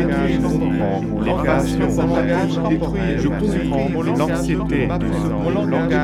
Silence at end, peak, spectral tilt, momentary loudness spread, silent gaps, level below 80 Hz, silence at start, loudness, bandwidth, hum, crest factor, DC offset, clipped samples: 0 s; -4 dBFS; -7.5 dB/octave; 3 LU; none; -30 dBFS; 0 s; -19 LUFS; 13 kHz; none; 14 dB; under 0.1%; under 0.1%